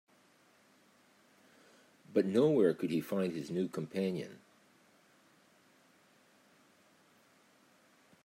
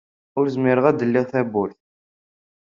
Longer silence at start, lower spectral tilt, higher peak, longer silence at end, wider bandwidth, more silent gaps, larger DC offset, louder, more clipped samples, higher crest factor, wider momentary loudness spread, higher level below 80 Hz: first, 2.1 s vs 0.35 s; about the same, -7 dB/octave vs -7 dB/octave; second, -16 dBFS vs -2 dBFS; first, 3.85 s vs 1 s; first, 16 kHz vs 7.2 kHz; neither; neither; second, -33 LUFS vs -21 LUFS; neither; about the same, 22 dB vs 20 dB; about the same, 9 LU vs 10 LU; second, -84 dBFS vs -64 dBFS